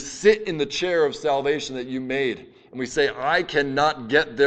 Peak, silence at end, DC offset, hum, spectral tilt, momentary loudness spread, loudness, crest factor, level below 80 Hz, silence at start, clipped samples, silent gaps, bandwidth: -4 dBFS; 0 s; under 0.1%; none; -4 dB/octave; 10 LU; -23 LUFS; 18 dB; -54 dBFS; 0 s; under 0.1%; none; 8.8 kHz